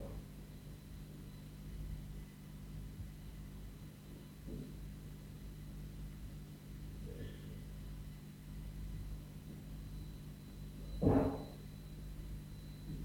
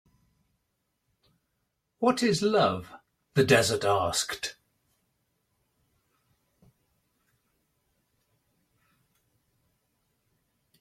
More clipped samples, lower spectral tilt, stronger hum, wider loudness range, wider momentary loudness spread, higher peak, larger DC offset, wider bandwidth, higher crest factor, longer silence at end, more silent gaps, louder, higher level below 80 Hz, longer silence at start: neither; first, -7.5 dB/octave vs -4 dB/octave; first, 50 Hz at -50 dBFS vs none; about the same, 10 LU vs 9 LU; second, 5 LU vs 12 LU; second, -18 dBFS vs -8 dBFS; neither; first, over 20 kHz vs 16 kHz; about the same, 26 dB vs 24 dB; second, 0 s vs 6.3 s; neither; second, -47 LUFS vs -26 LUFS; first, -52 dBFS vs -66 dBFS; second, 0 s vs 2 s